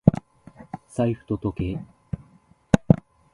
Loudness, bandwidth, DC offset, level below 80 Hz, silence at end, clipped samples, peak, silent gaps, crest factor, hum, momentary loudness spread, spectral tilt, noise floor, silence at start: -25 LUFS; 11.5 kHz; under 0.1%; -44 dBFS; 0.4 s; under 0.1%; 0 dBFS; none; 24 dB; none; 16 LU; -8.5 dB/octave; -57 dBFS; 0.05 s